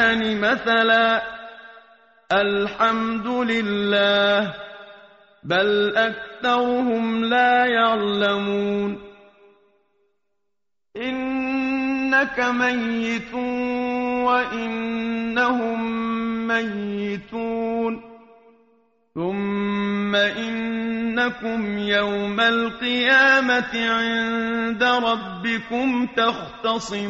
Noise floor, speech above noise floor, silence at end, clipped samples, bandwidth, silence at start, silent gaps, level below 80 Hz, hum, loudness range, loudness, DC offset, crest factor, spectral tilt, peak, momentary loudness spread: -83 dBFS; 62 dB; 0 s; under 0.1%; 7.6 kHz; 0 s; none; -56 dBFS; none; 7 LU; -21 LUFS; under 0.1%; 18 dB; -2 dB/octave; -4 dBFS; 10 LU